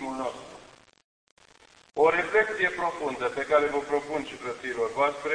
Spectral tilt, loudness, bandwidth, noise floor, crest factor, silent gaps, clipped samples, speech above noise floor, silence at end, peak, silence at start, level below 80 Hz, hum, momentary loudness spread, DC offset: -4 dB/octave; -27 LUFS; 10.5 kHz; -57 dBFS; 20 dB; 1.04-1.37 s; under 0.1%; 30 dB; 0 s; -8 dBFS; 0 s; -62 dBFS; none; 12 LU; under 0.1%